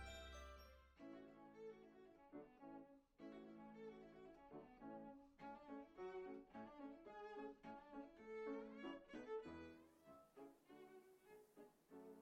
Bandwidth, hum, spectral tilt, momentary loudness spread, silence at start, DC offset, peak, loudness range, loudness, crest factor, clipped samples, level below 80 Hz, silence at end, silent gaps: 16 kHz; none; -5.5 dB/octave; 13 LU; 0 s; under 0.1%; -40 dBFS; 6 LU; -59 LUFS; 18 dB; under 0.1%; -74 dBFS; 0 s; none